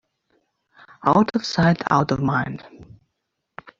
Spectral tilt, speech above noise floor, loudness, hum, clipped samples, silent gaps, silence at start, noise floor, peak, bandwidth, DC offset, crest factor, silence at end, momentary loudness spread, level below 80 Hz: -6.5 dB/octave; 58 dB; -20 LUFS; none; under 0.1%; none; 1.05 s; -78 dBFS; -2 dBFS; 7.6 kHz; under 0.1%; 20 dB; 0.95 s; 8 LU; -52 dBFS